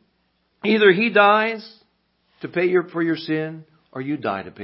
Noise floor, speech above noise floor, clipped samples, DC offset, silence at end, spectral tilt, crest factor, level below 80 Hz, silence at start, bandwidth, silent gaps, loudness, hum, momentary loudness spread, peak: -68 dBFS; 48 dB; under 0.1%; under 0.1%; 0 s; -10 dB/octave; 20 dB; -68 dBFS; 0.65 s; 5.8 kHz; none; -19 LUFS; none; 17 LU; -2 dBFS